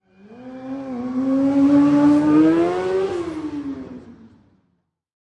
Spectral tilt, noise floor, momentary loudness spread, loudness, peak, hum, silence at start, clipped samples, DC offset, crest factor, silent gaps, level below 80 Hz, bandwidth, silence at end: -7.5 dB/octave; -69 dBFS; 18 LU; -18 LUFS; -6 dBFS; none; 0.3 s; under 0.1%; under 0.1%; 14 dB; none; -56 dBFS; 8.6 kHz; 1.1 s